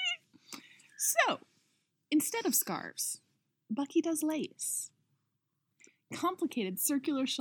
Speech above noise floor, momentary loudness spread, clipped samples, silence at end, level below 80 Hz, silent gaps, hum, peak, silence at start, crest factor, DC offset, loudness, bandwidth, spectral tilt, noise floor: 49 dB; 16 LU; under 0.1%; 0 s; under -90 dBFS; none; none; -12 dBFS; 0 s; 22 dB; under 0.1%; -33 LUFS; 19 kHz; -2 dB/octave; -82 dBFS